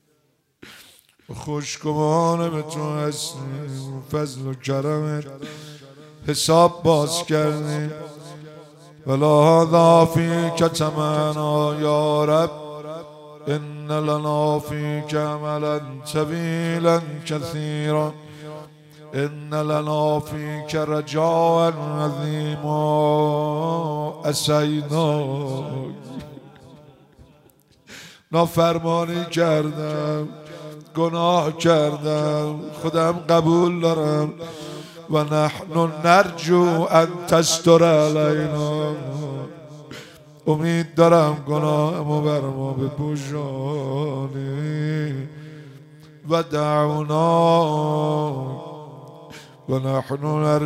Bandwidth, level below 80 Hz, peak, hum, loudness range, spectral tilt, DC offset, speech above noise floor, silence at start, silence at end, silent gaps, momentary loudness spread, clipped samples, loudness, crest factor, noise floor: 15.5 kHz; -60 dBFS; -2 dBFS; none; 7 LU; -6 dB/octave; under 0.1%; 46 dB; 0.65 s; 0 s; none; 19 LU; under 0.1%; -21 LUFS; 20 dB; -66 dBFS